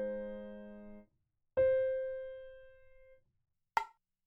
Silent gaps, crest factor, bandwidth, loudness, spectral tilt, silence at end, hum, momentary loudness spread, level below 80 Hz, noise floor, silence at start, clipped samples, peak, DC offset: none; 22 dB; 7 kHz; -36 LUFS; -4 dB/octave; 0.35 s; none; 23 LU; -64 dBFS; -80 dBFS; 0 s; under 0.1%; -16 dBFS; under 0.1%